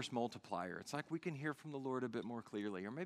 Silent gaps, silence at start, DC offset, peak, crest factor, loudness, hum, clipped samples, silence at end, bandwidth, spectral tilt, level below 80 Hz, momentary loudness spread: none; 0 s; under 0.1%; -26 dBFS; 18 dB; -45 LUFS; none; under 0.1%; 0 s; 14.5 kHz; -5.5 dB/octave; -86 dBFS; 4 LU